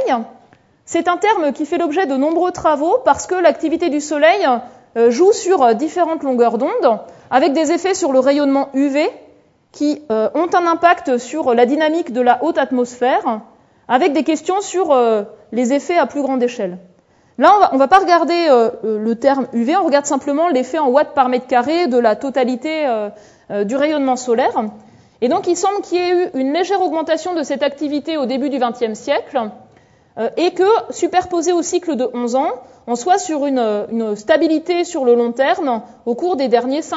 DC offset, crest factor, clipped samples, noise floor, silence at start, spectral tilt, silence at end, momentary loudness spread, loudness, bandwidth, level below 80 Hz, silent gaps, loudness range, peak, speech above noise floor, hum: under 0.1%; 16 dB; under 0.1%; -50 dBFS; 0 s; -4 dB/octave; 0 s; 8 LU; -16 LUFS; 8 kHz; -60 dBFS; none; 4 LU; 0 dBFS; 35 dB; none